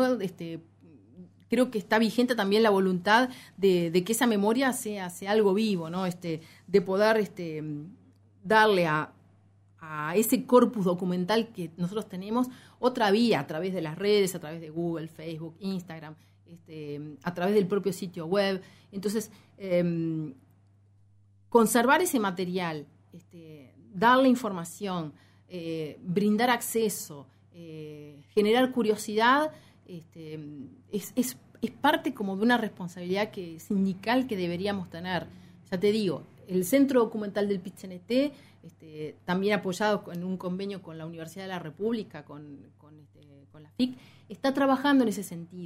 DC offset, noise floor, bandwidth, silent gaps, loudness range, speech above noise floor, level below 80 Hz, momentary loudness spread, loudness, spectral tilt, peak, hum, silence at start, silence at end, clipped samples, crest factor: under 0.1%; -61 dBFS; 16 kHz; none; 6 LU; 33 dB; -72 dBFS; 19 LU; -27 LUFS; -5 dB/octave; -6 dBFS; none; 0 s; 0 s; under 0.1%; 22 dB